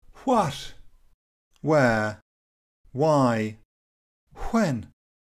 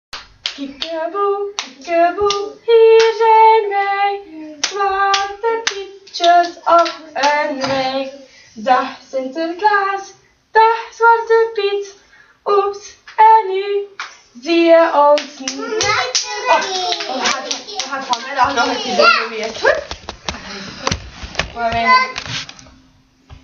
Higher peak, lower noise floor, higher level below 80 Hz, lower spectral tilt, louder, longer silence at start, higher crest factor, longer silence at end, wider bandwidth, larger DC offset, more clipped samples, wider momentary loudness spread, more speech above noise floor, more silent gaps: second, -8 dBFS vs 0 dBFS; first, under -90 dBFS vs -52 dBFS; about the same, -50 dBFS vs -46 dBFS; first, -6.5 dB/octave vs -2.5 dB/octave; second, -24 LUFS vs -15 LUFS; about the same, 0.1 s vs 0.15 s; about the same, 18 dB vs 16 dB; first, 0.5 s vs 0.1 s; first, 15 kHz vs 7.6 kHz; neither; neither; about the same, 18 LU vs 16 LU; first, over 67 dB vs 37 dB; first, 1.14-1.51 s, 2.22-2.84 s, 3.65-4.27 s vs none